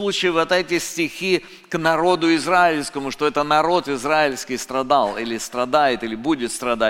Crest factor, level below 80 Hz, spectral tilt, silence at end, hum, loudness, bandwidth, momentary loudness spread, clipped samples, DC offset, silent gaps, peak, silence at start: 18 dB; -52 dBFS; -3.5 dB/octave; 0 s; none; -20 LUFS; 17 kHz; 7 LU; under 0.1%; under 0.1%; none; -2 dBFS; 0 s